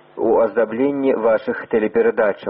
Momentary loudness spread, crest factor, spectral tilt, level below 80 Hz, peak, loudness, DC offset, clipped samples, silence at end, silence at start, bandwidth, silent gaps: 4 LU; 12 dB; -5 dB/octave; -58 dBFS; -6 dBFS; -18 LUFS; under 0.1%; under 0.1%; 0 s; 0.15 s; 5.2 kHz; none